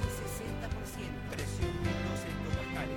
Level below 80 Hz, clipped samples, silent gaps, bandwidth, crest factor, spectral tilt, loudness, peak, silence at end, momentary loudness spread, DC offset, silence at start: -42 dBFS; under 0.1%; none; 18 kHz; 16 dB; -5.5 dB/octave; -37 LUFS; -20 dBFS; 0 s; 5 LU; under 0.1%; 0 s